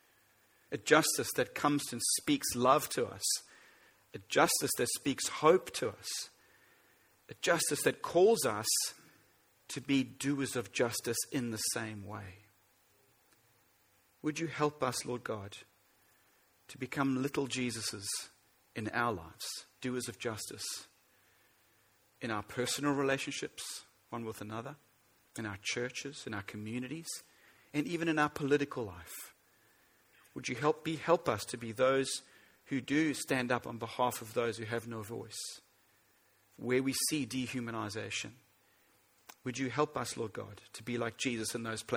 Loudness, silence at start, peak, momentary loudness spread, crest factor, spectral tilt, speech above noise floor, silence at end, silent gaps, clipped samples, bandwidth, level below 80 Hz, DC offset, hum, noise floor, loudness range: -34 LUFS; 0.7 s; -10 dBFS; 15 LU; 26 dB; -3.5 dB/octave; 36 dB; 0 s; none; under 0.1%; over 20 kHz; -72 dBFS; under 0.1%; none; -70 dBFS; 8 LU